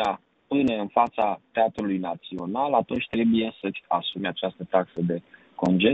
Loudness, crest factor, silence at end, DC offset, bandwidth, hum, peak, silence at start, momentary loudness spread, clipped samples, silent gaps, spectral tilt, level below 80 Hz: -26 LUFS; 20 dB; 0 s; under 0.1%; 8 kHz; none; -6 dBFS; 0 s; 9 LU; under 0.1%; none; -7.5 dB/octave; -60 dBFS